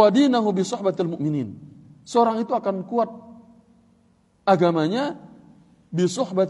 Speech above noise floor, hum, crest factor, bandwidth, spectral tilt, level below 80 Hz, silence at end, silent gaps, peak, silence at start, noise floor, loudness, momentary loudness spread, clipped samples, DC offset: 40 dB; none; 20 dB; 11.5 kHz; -6.5 dB/octave; -68 dBFS; 0 s; none; -2 dBFS; 0 s; -60 dBFS; -22 LUFS; 12 LU; under 0.1%; under 0.1%